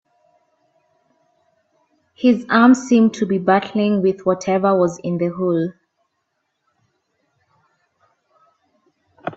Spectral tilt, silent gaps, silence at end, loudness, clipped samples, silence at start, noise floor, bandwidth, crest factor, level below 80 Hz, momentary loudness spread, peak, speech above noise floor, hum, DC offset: -6.5 dB/octave; none; 0.05 s; -17 LUFS; under 0.1%; 2.2 s; -73 dBFS; 8 kHz; 20 dB; -64 dBFS; 9 LU; 0 dBFS; 56 dB; none; under 0.1%